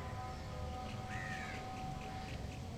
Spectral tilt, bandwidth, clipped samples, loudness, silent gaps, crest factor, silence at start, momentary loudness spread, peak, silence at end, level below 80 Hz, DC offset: -5.5 dB/octave; 17.5 kHz; under 0.1%; -45 LUFS; none; 14 dB; 0 s; 3 LU; -30 dBFS; 0 s; -52 dBFS; under 0.1%